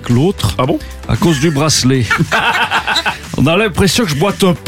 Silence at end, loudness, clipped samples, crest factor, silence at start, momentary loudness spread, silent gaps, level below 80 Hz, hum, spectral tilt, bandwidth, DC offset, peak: 0 s; -13 LUFS; under 0.1%; 12 dB; 0 s; 5 LU; none; -32 dBFS; none; -4.5 dB/octave; 16.5 kHz; 0.5%; 0 dBFS